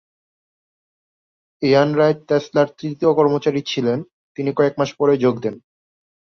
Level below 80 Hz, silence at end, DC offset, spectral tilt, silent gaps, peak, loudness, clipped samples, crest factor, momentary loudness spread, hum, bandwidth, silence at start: -62 dBFS; 0.75 s; under 0.1%; -6.5 dB/octave; 4.13-4.35 s; -2 dBFS; -19 LUFS; under 0.1%; 18 dB; 10 LU; none; 6.8 kHz; 1.6 s